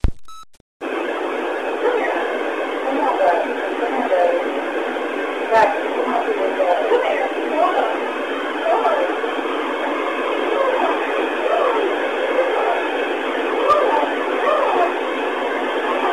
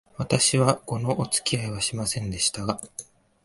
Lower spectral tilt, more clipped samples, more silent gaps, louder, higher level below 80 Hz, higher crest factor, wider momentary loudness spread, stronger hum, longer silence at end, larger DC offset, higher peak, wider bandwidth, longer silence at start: first, -5 dB/octave vs -3.5 dB/octave; neither; first, 0.61-0.80 s vs none; first, -19 LUFS vs -24 LUFS; first, -38 dBFS vs -52 dBFS; second, 14 dB vs 22 dB; second, 6 LU vs 11 LU; neither; second, 0 s vs 0.4 s; first, 0.4% vs under 0.1%; about the same, -4 dBFS vs -4 dBFS; first, 13.5 kHz vs 12 kHz; second, 0.05 s vs 0.2 s